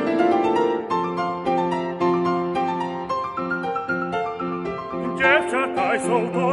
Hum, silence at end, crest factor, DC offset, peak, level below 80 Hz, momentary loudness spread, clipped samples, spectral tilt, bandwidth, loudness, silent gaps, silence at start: none; 0 s; 20 dB; under 0.1%; -4 dBFS; -56 dBFS; 8 LU; under 0.1%; -6 dB/octave; 11.5 kHz; -22 LUFS; none; 0 s